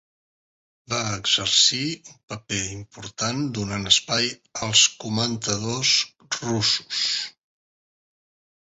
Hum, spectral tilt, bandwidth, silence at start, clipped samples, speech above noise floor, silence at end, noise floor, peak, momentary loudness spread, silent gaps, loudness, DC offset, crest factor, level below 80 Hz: none; -2 dB/octave; 8.4 kHz; 0.9 s; under 0.1%; over 66 dB; 1.35 s; under -90 dBFS; -2 dBFS; 14 LU; 2.23-2.28 s; -21 LUFS; under 0.1%; 22 dB; -56 dBFS